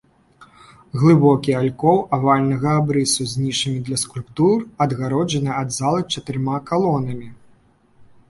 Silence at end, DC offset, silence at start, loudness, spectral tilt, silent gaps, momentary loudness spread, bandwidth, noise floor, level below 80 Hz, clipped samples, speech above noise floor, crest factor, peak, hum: 0.25 s; under 0.1%; 0.4 s; -19 LUFS; -5.5 dB/octave; none; 8 LU; 11.5 kHz; -54 dBFS; -54 dBFS; under 0.1%; 36 dB; 18 dB; -2 dBFS; none